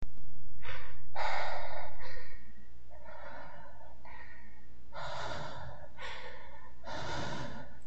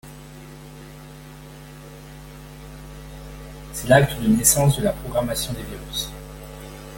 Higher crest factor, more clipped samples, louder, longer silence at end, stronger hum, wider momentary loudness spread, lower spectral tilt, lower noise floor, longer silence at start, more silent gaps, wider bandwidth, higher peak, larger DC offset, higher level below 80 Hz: second, 10 dB vs 24 dB; neither; second, -43 LUFS vs -20 LUFS; about the same, 0 s vs 0 s; neither; second, 18 LU vs 24 LU; about the same, -4.5 dB/octave vs -4.5 dB/octave; first, -55 dBFS vs -41 dBFS; about the same, 0 s vs 0.05 s; neither; second, 9 kHz vs 17 kHz; second, -16 dBFS vs 0 dBFS; first, 2% vs under 0.1%; second, -54 dBFS vs -40 dBFS